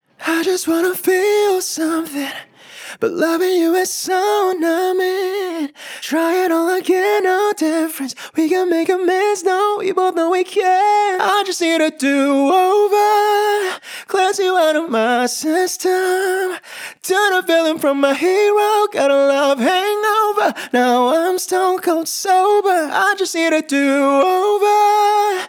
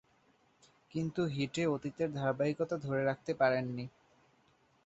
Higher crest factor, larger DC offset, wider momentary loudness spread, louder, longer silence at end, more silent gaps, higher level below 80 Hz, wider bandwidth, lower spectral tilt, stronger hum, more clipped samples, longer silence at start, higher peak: second, 14 dB vs 20 dB; neither; second, 7 LU vs 10 LU; first, -16 LUFS vs -35 LUFS; second, 0 s vs 0.95 s; neither; second, -78 dBFS vs -70 dBFS; first, over 20 kHz vs 8 kHz; second, -2 dB/octave vs -5.5 dB/octave; neither; neither; second, 0.2 s vs 0.95 s; first, -2 dBFS vs -16 dBFS